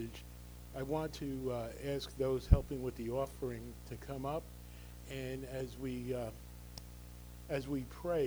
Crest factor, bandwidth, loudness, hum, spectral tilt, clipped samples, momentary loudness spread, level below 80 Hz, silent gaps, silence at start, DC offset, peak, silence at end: 28 dB; over 20 kHz; -40 LUFS; 60 Hz at -50 dBFS; -6.5 dB/octave; under 0.1%; 16 LU; -46 dBFS; none; 0 s; under 0.1%; -10 dBFS; 0 s